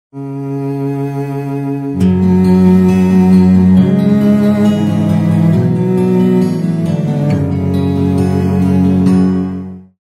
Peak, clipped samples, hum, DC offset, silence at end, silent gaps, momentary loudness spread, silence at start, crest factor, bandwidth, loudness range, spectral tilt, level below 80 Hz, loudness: 0 dBFS; under 0.1%; none; under 0.1%; 0.2 s; none; 11 LU; 0.15 s; 10 dB; 9 kHz; 4 LU; -9 dB/octave; -48 dBFS; -12 LUFS